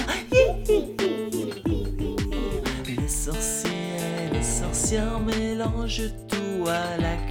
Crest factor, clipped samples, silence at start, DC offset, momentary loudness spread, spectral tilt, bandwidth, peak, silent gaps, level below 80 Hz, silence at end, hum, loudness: 20 dB; under 0.1%; 0 s; under 0.1%; 7 LU; -4.5 dB/octave; 17.5 kHz; -6 dBFS; none; -32 dBFS; 0 s; none; -26 LUFS